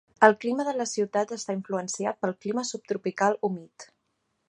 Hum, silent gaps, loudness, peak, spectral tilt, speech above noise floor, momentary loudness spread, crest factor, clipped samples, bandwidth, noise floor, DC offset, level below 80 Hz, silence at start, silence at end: none; none; -27 LUFS; -2 dBFS; -4 dB/octave; 50 dB; 11 LU; 26 dB; under 0.1%; 11 kHz; -76 dBFS; under 0.1%; -78 dBFS; 0.2 s; 0.65 s